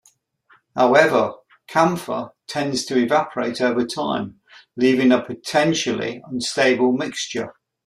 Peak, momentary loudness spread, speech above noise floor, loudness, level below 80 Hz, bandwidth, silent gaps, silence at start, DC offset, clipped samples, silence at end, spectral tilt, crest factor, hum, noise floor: -2 dBFS; 13 LU; 39 dB; -20 LUFS; -64 dBFS; 14 kHz; none; 0.75 s; under 0.1%; under 0.1%; 0.35 s; -4.5 dB/octave; 20 dB; none; -58 dBFS